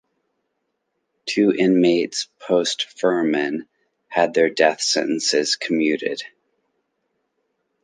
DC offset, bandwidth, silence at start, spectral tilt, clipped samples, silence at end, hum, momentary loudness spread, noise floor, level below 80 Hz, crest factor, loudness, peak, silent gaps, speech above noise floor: under 0.1%; 10 kHz; 1.25 s; -3.5 dB/octave; under 0.1%; 1.55 s; none; 11 LU; -75 dBFS; -74 dBFS; 20 dB; -20 LUFS; -2 dBFS; none; 55 dB